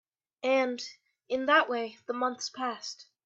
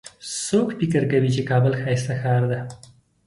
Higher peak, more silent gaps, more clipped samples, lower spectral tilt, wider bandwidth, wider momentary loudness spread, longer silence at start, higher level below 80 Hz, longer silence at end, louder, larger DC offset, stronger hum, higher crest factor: about the same, -10 dBFS vs -8 dBFS; neither; neither; second, -1.5 dB/octave vs -6 dB/octave; second, 7.8 kHz vs 11.5 kHz; first, 15 LU vs 9 LU; first, 0.45 s vs 0.05 s; second, -82 dBFS vs -56 dBFS; second, 0.25 s vs 0.5 s; second, -30 LUFS vs -22 LUFS; neither; neither; first, 22 dB vs 14 dB